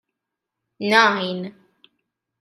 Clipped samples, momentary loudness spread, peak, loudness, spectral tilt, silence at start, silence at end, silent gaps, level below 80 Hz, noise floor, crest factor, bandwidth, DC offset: under 0.1%; 16 LU; -2 dBFS; -18 LUFS; -4 dB/octave; 0.8 s; 0.9 s; none; -76 dBFS; -83 dBFS; 22 dB; 13.5 kHz; under 0.1%